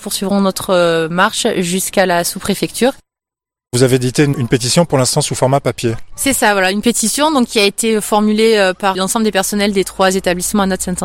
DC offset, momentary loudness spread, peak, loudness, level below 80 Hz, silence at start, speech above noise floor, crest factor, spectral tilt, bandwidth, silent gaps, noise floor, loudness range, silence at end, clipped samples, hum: under 0.1%; 5 LU; 0 dBFS; -14 LUFS; -42 dBFS; 0 s; 74 dB; 14 dB; -4 dB/octave; 16.5 kHz; none; -87 dBFS; 2 LU; 0 s; under 0.1%; none